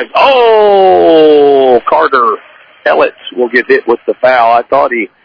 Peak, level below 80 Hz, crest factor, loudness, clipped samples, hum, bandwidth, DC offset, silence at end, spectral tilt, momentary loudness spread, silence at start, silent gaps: 0 dBFS; -50 dBFS; 8 dB; -8 LUFS; 2%; none; 5.4 kHz; under 0.1%; 0.2 s; -6 dB/octave; 8 LU; 0 s; none